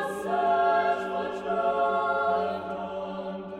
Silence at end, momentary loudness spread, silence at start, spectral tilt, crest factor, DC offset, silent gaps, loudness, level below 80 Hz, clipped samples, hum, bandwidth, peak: 0 s; 11 LU; 0 s; -5.5 dB/octave; 14 dB; under 0.1%; none; -27 LUFS; -64 dBFS; under 0.1%; none; 12.5 kHz; -14 dBFS